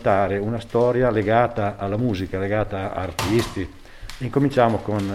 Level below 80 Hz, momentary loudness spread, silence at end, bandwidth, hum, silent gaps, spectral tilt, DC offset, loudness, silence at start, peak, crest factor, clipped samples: -42 dBFS; 11 LU; 0 s; 16 kHz; none; none; -6.5 dB/octave; under 0.1%; -22 LUFS; 0 s; -2 dBFS; 18 dB; under 0.1%